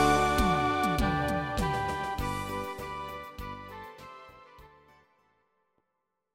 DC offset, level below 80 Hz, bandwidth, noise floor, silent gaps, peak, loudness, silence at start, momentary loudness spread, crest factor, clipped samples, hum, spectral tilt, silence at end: under 0.1%; -42 dBFS; 16.5 kHz; -82 dBFS; none; -12 dBFS; -30 LUFS; 0 s; 20 LU; 20 dB; under 0.1%; none; -5 dB/octave; 1.7 s